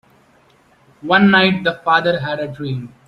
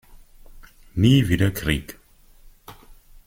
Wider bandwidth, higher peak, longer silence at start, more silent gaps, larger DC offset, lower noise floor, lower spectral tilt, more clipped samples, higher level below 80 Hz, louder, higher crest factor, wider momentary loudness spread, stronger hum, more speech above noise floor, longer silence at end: second, 6.2 kHz vs 16.5 kHz; first, 0 dBFS vs -6 dBFS; first, 1.05 s vs 0.55 s; neither; neither; about the same, -53 dBFS vs -50 dBFS; about the same, -7 dB/octave vs -6 dB/octave; neither; second, -56 dBFS vs -40 dBFS; first, -15 LUFS vs -21 LUFS; about the same, 18 dB vs 18 dB; about the same, 14 LU vs 15 LU; neither; first, 37 dB vs 31 dB; second, 0.2 s vs 0.55 s